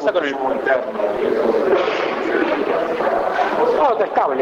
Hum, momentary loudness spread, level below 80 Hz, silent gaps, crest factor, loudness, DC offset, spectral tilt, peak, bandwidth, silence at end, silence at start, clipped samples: none; 4 LU; -54 dBFS; none; 12 dB; -18 LUFS; under 0.1%; -5 dB/octave; -6 dBFS; 11 kHz; 0 s; 0 s; under 0.1%